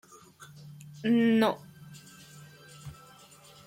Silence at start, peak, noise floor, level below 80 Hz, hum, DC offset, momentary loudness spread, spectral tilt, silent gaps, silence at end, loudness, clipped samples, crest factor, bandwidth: 0.65 s; -14 dBFS; -54 dBFS; -70 dBFS; none; under 0.1%; 26 LU; -6 dB/octave; none; 0.75 s; -27 LUFS; under 0.1%; 18 dB; 16 kHz